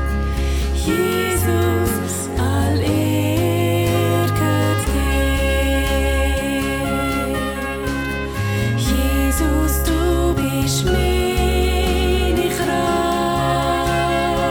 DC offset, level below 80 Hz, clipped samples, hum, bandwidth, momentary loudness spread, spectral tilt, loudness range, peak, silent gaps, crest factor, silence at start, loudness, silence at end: under 0.1%; -24 dBFS; under 0.1%; none; 18.5 kHz; 4 LU; -5.5 dB/octave; 2 LU; -6 dBFS; none; 12 dB; 0 s; -19 LUFS; 0 s